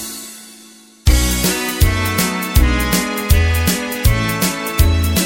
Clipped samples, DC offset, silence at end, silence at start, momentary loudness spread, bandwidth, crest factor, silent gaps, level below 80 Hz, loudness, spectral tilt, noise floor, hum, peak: under 0.1%; under 0.1%; 0 s; 0 s; 4 LU; 17 kHz; 16 dB; none; -20 dBFS; -16 LUFS; -4 dB/octave; -42 dBFS; none; 0 dBFS